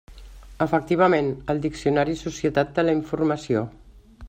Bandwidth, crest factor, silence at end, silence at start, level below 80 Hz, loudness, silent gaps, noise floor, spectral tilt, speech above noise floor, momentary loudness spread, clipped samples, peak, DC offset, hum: 9.2 kHz; 18 dB; 0 s; 0.1 s; -46 dBFS; -23 LUFS; none; -43 dBFS; -6.5 dB/octave; 20 dB; 7 LU; under 0.1%; -6 dBFS; under 0.1%; none